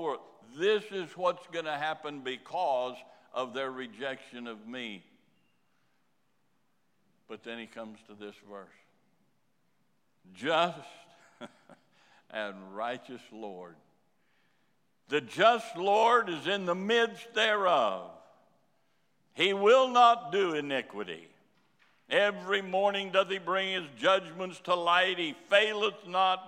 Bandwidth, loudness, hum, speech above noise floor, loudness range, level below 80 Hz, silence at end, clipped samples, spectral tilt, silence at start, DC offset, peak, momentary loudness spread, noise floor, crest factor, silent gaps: 14 kHz; -29 LUFS; none; 46 dB; 21 LU; under -90 dBFS; 0 s; under 0.1%; -3.5 dB/octave; 0 s; under 0.1%; -10 dBFS; 21 LU; -76 dBFS; 22 dB; none